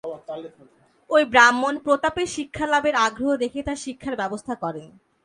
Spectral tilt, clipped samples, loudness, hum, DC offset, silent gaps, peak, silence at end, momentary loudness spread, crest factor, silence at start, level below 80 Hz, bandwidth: -3 dB/octave; under 0.1%; -21 LUFS; none; under 0.1%; none; 0 dBFS; 0.4 s; 18 LU; 22 dB; 0.05 s; -52 dBFS; 11.5 kHz